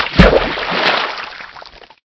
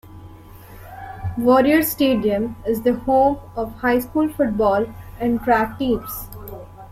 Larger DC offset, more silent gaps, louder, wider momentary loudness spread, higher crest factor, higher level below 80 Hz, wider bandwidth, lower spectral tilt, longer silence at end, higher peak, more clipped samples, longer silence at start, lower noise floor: neither; neither; first, -13 LUFS vs -19 LUFS; about the same, 20 LU vs 18 LU; about the same, 16 dB vs 16 dB; first, -24 dBFS vs -42 dBFS; second, 8 kHz vs 16.5 kHz; about the same, -6 dB/octave vs -6 dB/octave; first, 0.4 s vs 0.05 s; first, 0 dBFS vs -4 dBFS; first, 0.6% vs under 0.1%; about the same, 0 s vs 0.05 s; about the same, -38 dBFS vs -41 dBFS